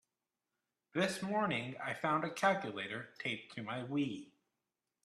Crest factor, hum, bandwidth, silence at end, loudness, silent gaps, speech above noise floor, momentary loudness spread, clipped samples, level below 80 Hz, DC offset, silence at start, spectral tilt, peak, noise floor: 22 dB; none; 13.5 kHz; 0.75 s; -37 LUFS; none; over 53 dB; 9 LU; under 0.1%; -80 dBFS; under 0.1%; 0.95 s; -5 dB/octave; -18 dBFS; under -90 dBFS